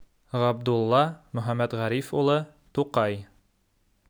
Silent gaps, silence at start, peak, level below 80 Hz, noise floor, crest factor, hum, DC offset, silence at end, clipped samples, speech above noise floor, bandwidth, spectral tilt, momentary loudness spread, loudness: none; 0 s; -8 dBFS; -64 dBFS; -68 dBFS; 18 dB; none; under 0.1%; 0.85 s; under 0.1%; 43 dB; over 20 kHz; -7 dB/octave; 10 LU; -26 LUFS